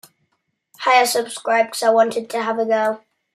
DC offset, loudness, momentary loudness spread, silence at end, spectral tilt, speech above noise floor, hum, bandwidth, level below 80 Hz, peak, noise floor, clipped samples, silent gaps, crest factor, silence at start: under 0.1%; -18 LUFS; 8 LU; 0.4 s; -2 dB/octave; 53 dB; none; 15.5 kHz; -78 dBFS; -2 dBFS; -71 dBFS; under 0.1%; none; 18 dB; 0.8 s